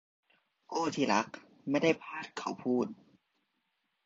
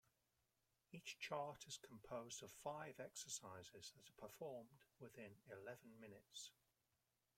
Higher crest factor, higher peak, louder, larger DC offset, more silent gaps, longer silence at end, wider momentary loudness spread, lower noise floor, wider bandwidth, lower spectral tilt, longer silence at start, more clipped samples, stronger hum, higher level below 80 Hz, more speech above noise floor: about the same, 22 dB vs 24 dB; first, -12 dBFS vs -32 dBFS; first, -33 LUFS vs -55 LUFS; neither; neither; first, 1.1 s vs 0.85 s; about the same, 11 LU vs 12 LU; second, -81 dBFS vs -89 dBFS; second, 7.8 kHz vs 16.5 kHz; first, -5 dB/octave vs -2.5 dB/octave; second, 0.7 s vs 0.9 s; neither; neither; first, -78 dBFS vs -86 dBFS; first, 48 dB vs 33 dB